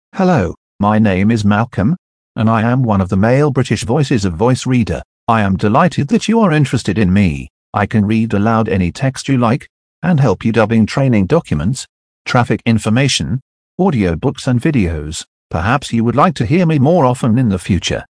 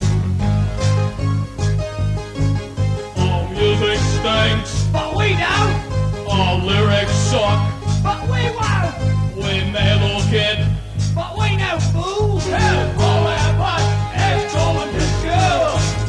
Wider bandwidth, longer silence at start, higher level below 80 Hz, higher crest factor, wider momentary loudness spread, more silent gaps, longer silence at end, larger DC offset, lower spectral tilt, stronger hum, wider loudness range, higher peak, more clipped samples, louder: about the same, 10.5 kHz vs 11 kHz; first, 0.15 s vs 0 s; second, -36 dBFS vs -28 dBFS; about the same, 14 dB vs 14 dB; first, 8 LU vs 5 LU; first, 0.57-0.79 s, 1.98-2.35 s, 5.05-5.27 s, 7.50-7.73 s, 9.69-10.02 s, 11.89-12.25 s, 13.42-13.78 s, 15.27-15.50 s vs none; about the same, 0.1 s vs 0 s; neither; about the same, -6.5 dB/octave vs -5.5 dB/octave; neither; about the same, 2 LU vs 2 LU; first, 0 dBFS vs -4 dBFS; neither; first, -14 LUFS vs -18 LUFS